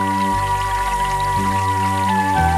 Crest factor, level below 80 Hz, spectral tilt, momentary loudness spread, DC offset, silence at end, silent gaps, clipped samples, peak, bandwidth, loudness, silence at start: 14 dB; -32 dBFS; -5 dB/octave; 2 LU; under 0.1%; 0 s; none; under 0.1%; -4 dBFS; 16.5 kHz; -18 LUFS; 0 s